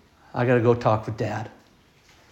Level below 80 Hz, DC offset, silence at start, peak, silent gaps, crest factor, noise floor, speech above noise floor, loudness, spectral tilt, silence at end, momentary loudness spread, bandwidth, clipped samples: -56 dBFS; under 0.1%; 0.35 s; -4 dBFS; none; 20 dB; -57 dBFS; 35 dB; -24 LUFS; -8 dB/octave; 0.8 s; 15 LU; 8 kHz; under 0.1%